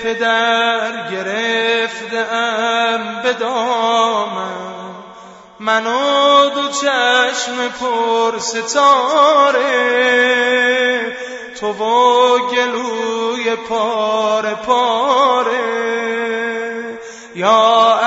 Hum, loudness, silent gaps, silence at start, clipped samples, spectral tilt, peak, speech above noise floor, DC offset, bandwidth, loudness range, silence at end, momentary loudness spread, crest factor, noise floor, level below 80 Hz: none; -15 LUFS; none; 0 s; under 0.1%; -2 dB/octave; 0 dBFS; 24 dB; under 0.1%; 8 kHz; 4 LU; 0 s; 12 LU; 16 dB; -38 dBFS; -62 dBFS